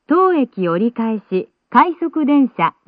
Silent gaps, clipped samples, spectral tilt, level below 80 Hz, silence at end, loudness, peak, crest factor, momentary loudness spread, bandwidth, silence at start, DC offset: none; under 0.1%; -10 dB/octave; -62 dBFS; 0.2 s; -17 LUFS; 0 dBFS; 16 dB; 8 LU; 4.9 kHz; 0.1 s; under 0.1%